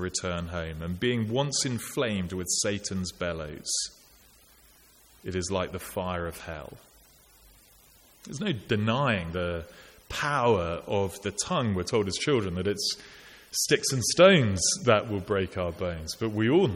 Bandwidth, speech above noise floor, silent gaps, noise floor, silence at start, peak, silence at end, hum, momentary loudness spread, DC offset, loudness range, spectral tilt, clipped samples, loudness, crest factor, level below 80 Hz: 17 kHz; 30 dB; none; -58 dBFS; 0 s; -6 dBFS; 0 s; none; 11 LU; under 0.1%; 11 LU; -4 dB/octave; under 0.1%; -27 LUFS; 22 dB; -52 dBFS